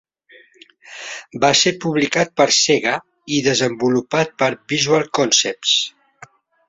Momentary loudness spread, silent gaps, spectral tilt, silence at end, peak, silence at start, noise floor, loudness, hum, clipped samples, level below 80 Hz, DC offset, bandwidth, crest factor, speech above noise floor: 13 LU; none; -2.5 dB/octave; 0.8 s; -2 dBFS; 0.9 s; -50 dBFS; -17 LUFS; none; under 0.1%; -60 dBFS; under 0.1%; 8 kHz; 18 dB; 33 dB